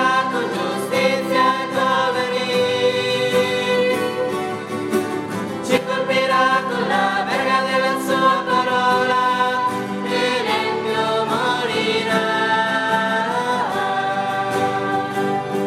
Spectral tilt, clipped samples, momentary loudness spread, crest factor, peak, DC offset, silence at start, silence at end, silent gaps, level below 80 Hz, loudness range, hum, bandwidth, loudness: -4 dB/octave; under 0.1%; 5 LU; 16 dB; -4 dBFS; under 0.1%; 0 s; 0 s; none; -64 dBFS; 2 LU; none; 15 kHz; -19 LUFS